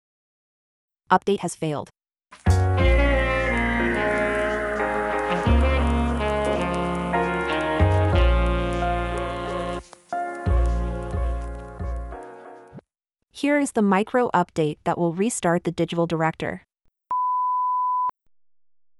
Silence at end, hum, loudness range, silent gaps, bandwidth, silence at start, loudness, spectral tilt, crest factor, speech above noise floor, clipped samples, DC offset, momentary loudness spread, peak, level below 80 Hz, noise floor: 0.9 s; none; 6 LU; none; 12 kHz; 1.1 s; -23 LUFS; -6 dB/octave; 20 dB; 56 dB; under 0.1%; under 0.1%; 12 LU; -4 dBFS; -30 dBFS; -78 dBFS